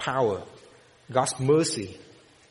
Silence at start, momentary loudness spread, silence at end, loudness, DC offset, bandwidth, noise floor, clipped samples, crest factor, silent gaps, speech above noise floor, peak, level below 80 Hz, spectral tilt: 0 s; 15 LU; 0.5 s; -26 LUFS; under 0.1%; 11.5 kHz; -54 dBFS; under 0.1%; 20 dB; none; 29 dB; -8 dBFS; -62 dBFS; -4.5 dB/octave